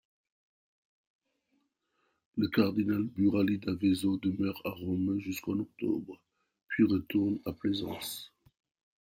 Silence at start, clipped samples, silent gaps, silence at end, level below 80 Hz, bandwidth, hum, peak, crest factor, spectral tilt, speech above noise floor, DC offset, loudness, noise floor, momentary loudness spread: 2.35 s; under 0.1%; none; 0.75 s; -66 dBFS; 16.5 kHz; none; -12 dBFS; 20 dB; -6.5 dB/octave; 47 dB; under 0.1%; -32 LUFS; -78 dBFS; 10 LU